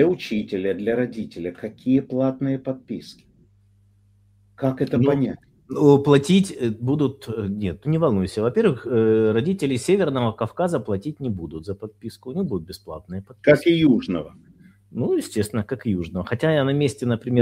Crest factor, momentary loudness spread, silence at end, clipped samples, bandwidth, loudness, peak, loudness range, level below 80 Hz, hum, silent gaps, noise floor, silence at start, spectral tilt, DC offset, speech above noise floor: 20 dB; 15 LU; 0 s; under 0.1%; 15.5 kHz; -22 LUFS; 0 dBFS; 6 LU; -54 dBFS; 50 Hz at -50 dBFS; none; -57 dBFS; 0 s; -7 dB/octave; under 0.1%; 36 dB